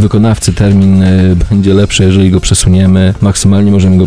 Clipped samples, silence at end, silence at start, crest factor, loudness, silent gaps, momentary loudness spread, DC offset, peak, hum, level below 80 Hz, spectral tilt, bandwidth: 2%; 0 s; 0 s; 6 dB; -8 LUFS; none; 3 LU; 3%; 0 dBFS; none; -22 dBFS; -6 dB/octave; 11 kHz